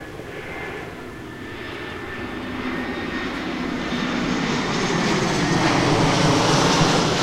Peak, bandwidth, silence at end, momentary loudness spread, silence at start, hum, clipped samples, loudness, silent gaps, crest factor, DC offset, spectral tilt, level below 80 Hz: -4 dBFS; 15.5 kHz; 0 s; 16 LU; 0 s; none; under 0.1%; -21 LUFS; none; 18 dB; under 0.1%; -4.5 dB/octave; -40 dBFS